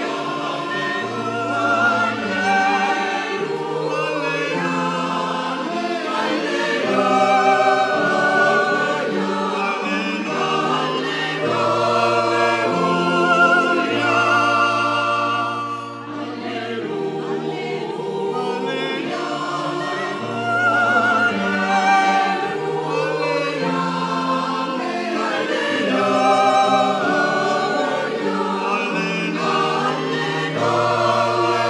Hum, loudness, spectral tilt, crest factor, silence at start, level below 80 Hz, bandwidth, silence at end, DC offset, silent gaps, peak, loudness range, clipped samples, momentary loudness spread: none; -19 LUFS; -4.5 dB/octave; 16 dB; 0 s; -70 dBFS; 12 kHz; 0 s; under 0.1%; none; -4 dBFS; 6 LU; under 0.1%; 8 LU